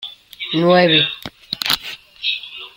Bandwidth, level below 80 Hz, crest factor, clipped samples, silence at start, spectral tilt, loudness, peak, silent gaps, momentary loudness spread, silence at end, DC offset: 17 kHz; -56 dBFS; 20 dB; under 0.1%; 0 s; -4.5 dB/octave; -16 LUFS; 0 dBFS; none; 19 LU; 0.1 s; under 0.1%